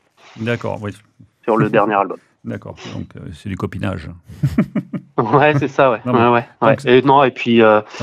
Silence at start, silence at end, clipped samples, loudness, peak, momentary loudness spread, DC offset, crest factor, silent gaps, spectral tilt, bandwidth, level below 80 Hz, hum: 0.35 s; 0 s; under 0.1%; -16 LUFS; 0 dBFS; 18 LU; under 0.1%; 16 dB; none; -7.5 dB/octave; 10.5 kHz; -48 dBFS; none